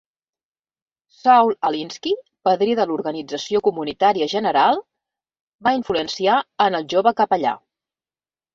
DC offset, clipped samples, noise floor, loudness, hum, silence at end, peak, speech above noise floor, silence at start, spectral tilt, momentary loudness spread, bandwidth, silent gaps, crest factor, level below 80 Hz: under 0.1%; under 0.1%; under -90 dBFS; -19 LUFS; none; 1 s; -4 dBFS; over 71 dB; 1.25 s; -4.5 dB/octave; 10 LU; 7.6 kHz; 5.41-5.59 s; 18 dB; -62 dBFS